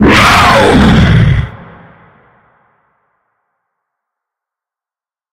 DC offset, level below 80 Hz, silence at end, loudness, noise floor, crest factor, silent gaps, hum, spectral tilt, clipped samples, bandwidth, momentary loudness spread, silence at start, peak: under 0.1%; -22 dBFS; 3.7 s; -6 LUFS; under -90 dBFS; 12 dB; none; none; -5.5 dB/octave; 0.2%; 16.5 kHz; 9 LU; 0 s; 0 dBFS